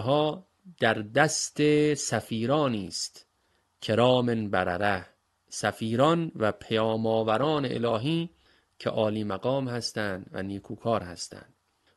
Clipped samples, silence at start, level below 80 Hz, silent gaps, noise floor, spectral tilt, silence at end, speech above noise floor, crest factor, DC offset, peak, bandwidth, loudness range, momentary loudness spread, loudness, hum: under 0.1%; 0 s; -58 dBFS; none; -71 dBFS; -5 dB/octave; 0.55 s; 44 dB; 22 dB; under 0.1%; -6 dBFS; 12.5 kHz; 4 LU; 12 LU; -27 LUFS; none